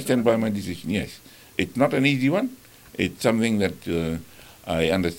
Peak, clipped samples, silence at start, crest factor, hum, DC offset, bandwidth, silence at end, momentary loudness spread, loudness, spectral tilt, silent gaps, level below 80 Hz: -4 dBFS; under 0.1%; 0 s; 20 dB; none; under 0.1%; 17 kHz; 0 s; 13 LU; -24 LUFS; -5.5 dB/octave; none; -50 dBFS